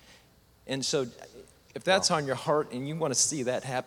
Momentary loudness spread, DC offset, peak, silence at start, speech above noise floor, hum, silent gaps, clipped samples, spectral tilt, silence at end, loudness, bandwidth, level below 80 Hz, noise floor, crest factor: 12 LU; under 0.1%; -10 dBFS; 0.1 s; 32 dB; none; none; under 0.1%; -3 dB/octave; 0 s; -28 LUFS; 18.5 kHz; -66 dBFS; -60 dBFS; 22 dB